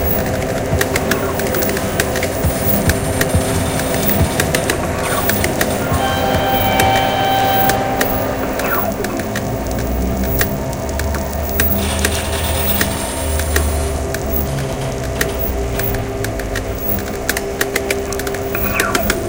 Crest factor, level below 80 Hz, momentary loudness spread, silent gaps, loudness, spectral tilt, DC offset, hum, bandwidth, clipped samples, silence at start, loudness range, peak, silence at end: 16 dB; -26 dBFS; 6 LU; none; -17 LUFS; -4.5 dB/octave; 0.2%; none; 17.5 kHz; under 0.1%; 0 s; 4 LU; 0 dBFS; 0 s